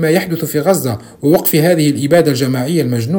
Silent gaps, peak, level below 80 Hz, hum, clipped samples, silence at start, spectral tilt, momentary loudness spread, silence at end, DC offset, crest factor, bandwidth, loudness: none; 0 dBFS; -50 dBFS; none; under 0.1%; 0 s; -6 dB/octave; 5 LU; 0 s; under 0.1%; 12 dB; 18 kHz; -13 LUFS